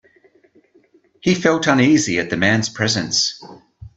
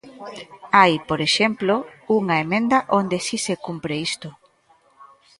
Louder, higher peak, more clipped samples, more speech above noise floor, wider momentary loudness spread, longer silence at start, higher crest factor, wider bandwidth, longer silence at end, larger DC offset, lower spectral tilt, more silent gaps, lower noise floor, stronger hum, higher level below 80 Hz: first, -17 LUFS vs -20 LUFS; about the same, 0 dBFS vs 0 dBFS; neither; about the same, 38 dB vs 38 dB; second, 7 LU vs 20 LU; first, 1.25 s vs 0.05 s; about the same, 18 dB vs 22 dB; second, 8.2 kHz vs 11.5 kHz; second, 0.1 s vs 0.35 s; neither; about the same, -4 dB/octave vs -4 dB/octave; neither; second, -55 dBFS vs -59 dBFS; neither; first, -54 dBFS vs -60 dBFS